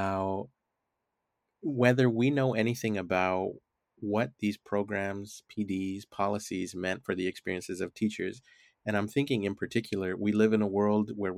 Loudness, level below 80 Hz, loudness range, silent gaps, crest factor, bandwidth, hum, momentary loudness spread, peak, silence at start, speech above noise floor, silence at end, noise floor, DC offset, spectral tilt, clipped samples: -31 LUFS; -72 dBFS; 5 LU; none; 22 dB; 15 kHz; none; 12 LU; -8 dBFS; 0 s; 54 dB; 0 s; -84 dBFS; under 0.1%; -6.5 dB/octave; under 0.1%